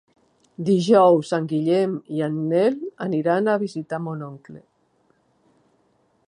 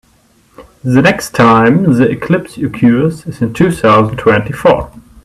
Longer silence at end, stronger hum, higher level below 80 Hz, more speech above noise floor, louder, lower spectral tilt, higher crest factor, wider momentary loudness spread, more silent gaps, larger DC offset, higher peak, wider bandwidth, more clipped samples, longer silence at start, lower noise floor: first, 1.7 s vs 0.25 s; neither; second, -72 dBFS vs -38 dBFS; first, 44 dB vs 40 dB; second, -21 LUFS vs -11 LUFS; about the same, -7 dB/octave vs -7 dB/octave; first, 20 dB vs 12 dB; first, 14 LU vs 10 LU; neither; neither; about the same, -2 dBFS vs 0 dBFS; second, 11 kHz vs 14 kHz; neither; about the same, 0.6 s vs 0.6 s; first, -64 dBFS vs -50 dBFS